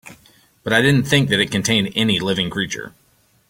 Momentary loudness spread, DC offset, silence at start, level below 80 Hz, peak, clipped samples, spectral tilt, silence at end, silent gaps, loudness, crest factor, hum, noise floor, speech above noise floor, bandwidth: 13 LU; under 0.1%; 0.05 s; -50 dBFS; -2 dBFS; under 0.1%; -4.5 dB/octave; 0.6 s; none; -17 LUFS; 18 dB; none; -53 dBFS; 35 dB; 17 kHz